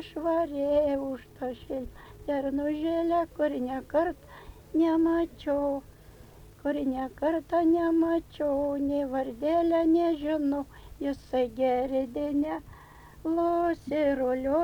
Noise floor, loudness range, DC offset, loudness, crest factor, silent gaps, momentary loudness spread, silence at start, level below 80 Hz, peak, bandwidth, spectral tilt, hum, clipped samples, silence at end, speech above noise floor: -51 dBFS; 4 LU; under 0.1%; -28 LUFS; 14 dB; none; 12 LU; 0 s; -52 dBFS; -14 dBFS; 19.5 kHz; -7 dB/octave; none; under 0.1%; 0 s; 23 dB